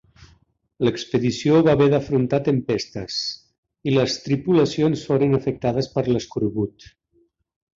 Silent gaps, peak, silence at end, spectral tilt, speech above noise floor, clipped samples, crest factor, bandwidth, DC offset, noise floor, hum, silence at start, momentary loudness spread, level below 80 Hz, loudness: 3.58-3.63 s; -4 dBFS; 1.05 s; -6.5 dB/octave; 44 dB; under 0.1%; 16 dB; 7.8 kHz; under 0.1%; -64 dBFS; none; 0.8 s; 9 LU; -52 dBFS; -21 LUFS